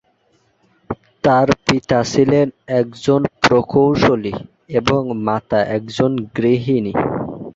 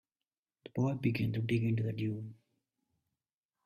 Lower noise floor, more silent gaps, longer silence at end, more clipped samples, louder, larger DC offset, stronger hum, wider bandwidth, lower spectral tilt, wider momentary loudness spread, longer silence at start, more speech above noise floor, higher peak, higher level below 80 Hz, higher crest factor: second, -60 dBFS vs under -90 dBFS; neither; second, 0.05 s vs 1.3 s; neither; first, -17 LUFS vs -35 LUFS; neither; neither; second, 8 kHz vs 13 kHz; second, -6 dB/octave vs -8.5 dB/octave; second, 8 LU vs 11 LU; first, 0.9 s vs 0.75 s; second, 44 dB vs over 57 dB; first, -2 dBFS vs -18 dBFS; first, -46 dBFS vs -68 dBFS; about the same, 16 dB vs 18 dB